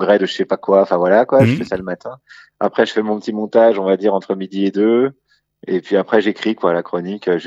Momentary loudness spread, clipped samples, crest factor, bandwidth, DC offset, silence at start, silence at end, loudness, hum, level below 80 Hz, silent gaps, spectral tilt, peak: 10 LU; under 0.1%; 16 dB; 8.2 kHz; under 0.1%; 0 s; 0 s; -16 LUFS; none; -58 dBFS; none; -7 dB/octave; 0 dBFS